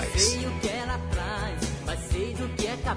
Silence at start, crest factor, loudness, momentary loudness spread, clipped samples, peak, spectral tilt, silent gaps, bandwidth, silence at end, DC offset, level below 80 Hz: 0 s; 20 dB; -28 LUFS; 8 LU; under 0.1%; -10 dBFS; -3.5 dB/octave; none; 11 kHz; 0 s; under 0.1%; -34 dBFS